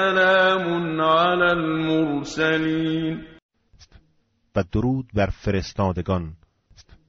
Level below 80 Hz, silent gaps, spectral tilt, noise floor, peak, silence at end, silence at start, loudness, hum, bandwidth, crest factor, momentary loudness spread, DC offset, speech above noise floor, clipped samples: -44 dBFS; 3.42-3.49 s; -4 dB/octave; -65 dBFS; -6 dBFS; 0.75 s; 0 s; -22 LUFS; none; 7.4 kHz; 16 dB; 10 LU; under 0.1%; 44 dB; under 0.1%